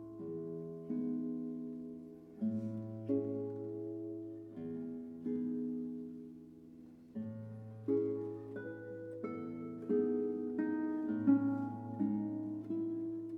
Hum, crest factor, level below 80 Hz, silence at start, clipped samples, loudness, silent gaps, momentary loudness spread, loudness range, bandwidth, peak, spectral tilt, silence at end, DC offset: none; 20 dB; -78 dBFS; 0 s; under 0.1%; -40 LUFS; none; 13 LU; 7 LU; 3.6 kHz; -20 dBFS; -11 dB/octave; 0 s; under 0.1%